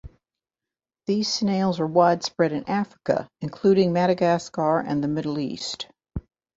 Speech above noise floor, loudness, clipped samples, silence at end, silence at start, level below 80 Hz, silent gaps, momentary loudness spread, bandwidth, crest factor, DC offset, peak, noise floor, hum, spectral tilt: 67 dB; -23 LUFS; under 0.1%; 0.35 s; 0.05 s; -50 dBFS; none; 15 LU; 8 kHz; 18 dB; under 0.1%; -6 dBFS; -90 dBFS; none; -5.5 dB/octave